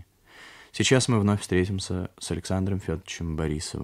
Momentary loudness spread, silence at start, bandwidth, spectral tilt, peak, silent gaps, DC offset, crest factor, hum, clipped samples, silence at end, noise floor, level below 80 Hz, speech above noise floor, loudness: 11 LU; 0.35 s; 14.5 kHz; -5 dB/octave; -6 dBFS; none; under 0.1%; 20 dB; none; under 0.1%; 0 s; -51 dBFS; -46 dBFS; 25 dB; -26 LUFS